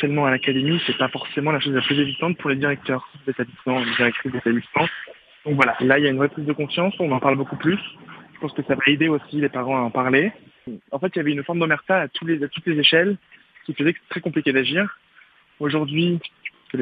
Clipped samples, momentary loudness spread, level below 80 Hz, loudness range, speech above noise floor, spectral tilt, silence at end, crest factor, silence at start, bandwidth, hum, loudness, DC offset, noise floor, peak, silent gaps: under 0.1%; 12 LU; -64 dBFS; 2 LU; 32 dB; -7.5 dB/octave; 0 s; 22 dB; 0 s; 5.6 kHz; none; -21 LUFS; under 0.1%; -54 dBFS; 0 dBFS; none